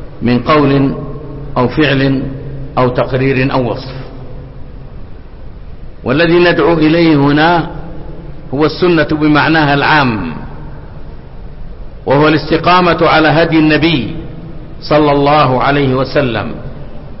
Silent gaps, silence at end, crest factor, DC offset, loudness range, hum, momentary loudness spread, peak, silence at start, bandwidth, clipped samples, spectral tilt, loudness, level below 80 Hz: none; 0 s; 12 dB; under 0.1%; 5 LU; none; 22 LU; 0 dBFS; 0 s; 5.8 kHz; under 0.1%; -10.5 dB/octave; -11 LUFS; -28 dBFS